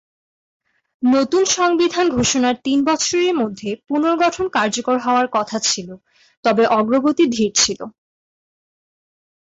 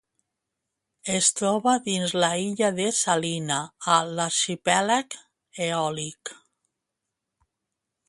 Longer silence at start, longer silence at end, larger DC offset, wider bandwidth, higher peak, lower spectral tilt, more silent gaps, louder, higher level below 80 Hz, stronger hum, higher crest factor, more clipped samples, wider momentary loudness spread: about the same, 1 s vs 1.05 s; second, 1.55 s vs 1.75 s; neither; second, 8 kHz vs 11.5 kHz; about the same, -2 dBFS vs -4 dBFS; about the same, -3 dB/octave vs -2.5 dB/octave; first, 6.37-6.43 s vs none; first, -17 LUFS vs -24 LUFS; first, -54 dBFS vs -70 dBFS; neither; second, 16 dB vs 22 dB; neither; second, 7 LU vs 12 LU